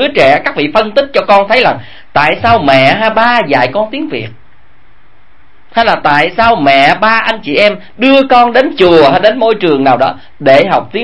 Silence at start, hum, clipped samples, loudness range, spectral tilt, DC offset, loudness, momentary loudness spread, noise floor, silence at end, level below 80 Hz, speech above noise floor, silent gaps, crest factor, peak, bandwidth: 0 s; none; 1%; 5 LU; -6 dB/octave; 3%; -8 LUFS; 8 LU; -47 dBFS; 0 s; -42 dBFS; 38 dB; none; 10 dB; 0 dBFS; 11 kHz